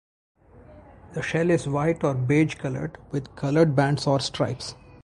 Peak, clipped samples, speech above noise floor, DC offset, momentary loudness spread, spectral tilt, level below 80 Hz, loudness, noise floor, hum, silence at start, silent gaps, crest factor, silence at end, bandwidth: -6 dBFS; under 0.1%; 25 dB; under 0.1%; 12 LU; -6.5 dB/octave; -52 dBFS; -24 LUFS; -49 dBFS; none; 0.55 s; none; 18 dB; 0.3 s; 11.5 kHz